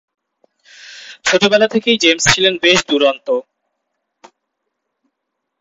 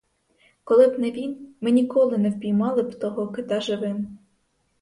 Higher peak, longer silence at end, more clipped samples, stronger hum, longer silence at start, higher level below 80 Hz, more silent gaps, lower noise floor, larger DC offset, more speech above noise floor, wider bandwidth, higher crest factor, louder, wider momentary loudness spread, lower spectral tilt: first, 0 dBFS vs -4 dBFS; first, 2.2 s vs 0.65 s; neither; neither; first, 0.85 s vs 0.65 s; first, -50 dBFS vs -66 dBFS; neither; first, -76 dBFS vs -69 dBFS; neither; first, 62 dB vs 47 dB; first, 16 kHz vs 11.5 kHz; about the same, 18 dB vs 18 dB; first, -13 LUFS vs -23 LUFS; second, 10 LU vs 13 LU; second, -2.5 dB/octave vs -7 dB/octave